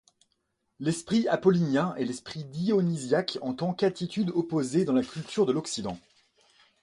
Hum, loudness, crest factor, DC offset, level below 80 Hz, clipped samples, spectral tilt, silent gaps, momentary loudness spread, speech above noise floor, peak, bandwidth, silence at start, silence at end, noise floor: none; -28 LUFS; 18 dB; under 0.1%; -66 dBFS; under 0.1%; -6 dB/octave; none; 10 LU; 50 dB; -10 dBFS; 11.5 kHz; 0.8 s; 0.85 s; -77 dBFS